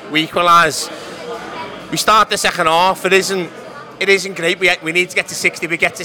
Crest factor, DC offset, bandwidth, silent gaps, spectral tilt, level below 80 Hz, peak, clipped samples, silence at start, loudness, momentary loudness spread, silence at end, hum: 16 dB; under 0.1%; over 20 kHz; none; -2.5 dB/octave; -50 dBFS; 0 dBFS; under 0.1%; 0 s; -14 LUFS; 17 LU; 0 s; none